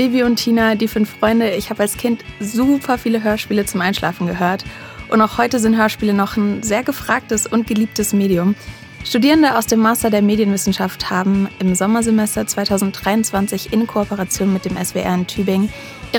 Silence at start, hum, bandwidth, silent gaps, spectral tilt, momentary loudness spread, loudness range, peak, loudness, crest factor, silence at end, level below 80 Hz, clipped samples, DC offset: 0 s; none; 19.5 kHz; none; -4.5 dB/octave; 6 LU; 3 LU; 0 dBFS; -17 LUFS; 16 dB; 0 s; -42 dBFS; under 0.1%; under 0.1%